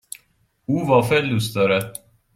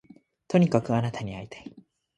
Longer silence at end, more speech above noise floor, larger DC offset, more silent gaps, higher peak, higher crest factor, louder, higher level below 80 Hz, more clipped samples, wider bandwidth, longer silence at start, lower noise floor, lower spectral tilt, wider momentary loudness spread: about the same, 0.45 s vs 0.35 s; first, 44 dB vs 23 dB; neither; neither; first, -2 dBFS vs -6 dBFS; about the same, 20 dB vs 22 dB; first, -20 LUFS vs -26 LUFS; about the same, -54 dBFS vs -58 dBFS; neither; first, 16 kHz vs 9.2 kHz; first, 0.7 s vs 0.5 s; first, -63 dBFS vs -49 dBFS; second, -5.5 dB/octave vs -7.5 dB/octave; about the same, 21 LU vs 21 LU